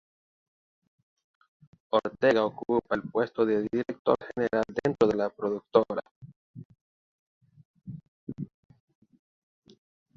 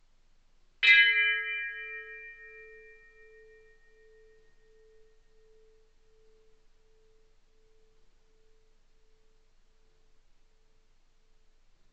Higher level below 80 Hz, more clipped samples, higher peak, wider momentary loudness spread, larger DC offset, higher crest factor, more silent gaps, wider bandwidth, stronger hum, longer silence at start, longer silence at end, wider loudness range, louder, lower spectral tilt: about the same, -66 dBFS vs -64 dBFS; neither; about the same, -6 dBFS vs -8 dBFS; second, 21 LU vs 29 LU; neither; about the same, 24 dB vs 26 dB; first, 3.99-4.05 s, 6.11-6.21 s, 6.36-6.54 s, 6.65-6.70 s, 6.81-7.41 s, 7.65-7.74 s, 8.08-8.27 s vs none; second, 7.4 kHz vs 8.2 kHz; neither; first, 1.95 s vs 0.8 s; second, 1.7 s vs 9.3 s; second, 20 LU vs 24 LU; second, -28 LUFS vs -23 LUFS; first, -7 dB/octave vs 1.5 dB/octave